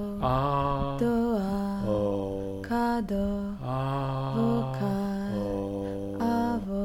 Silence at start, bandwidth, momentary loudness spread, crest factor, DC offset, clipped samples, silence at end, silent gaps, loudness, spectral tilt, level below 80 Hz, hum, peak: 0 s; 16.5 kHz; 6 LU; 14 dB; under 0.1%; under 0.1%; 0 s; none; -29 LUFS; -8 dB/octave; -44 dBFS; none; -14 dBFS